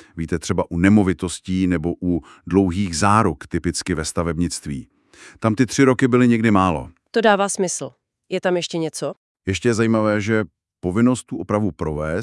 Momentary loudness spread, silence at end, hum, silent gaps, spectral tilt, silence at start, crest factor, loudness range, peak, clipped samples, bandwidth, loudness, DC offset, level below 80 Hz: 12 LU; 0 s; none; 9.17-9.35 s; -5.5 dB/octave; 0.15 s; 20 dB; 3 LU; 0 dBFS; under 0.1%; 12 kHz; -20 LUFS; under 0.1%; -46 dBFS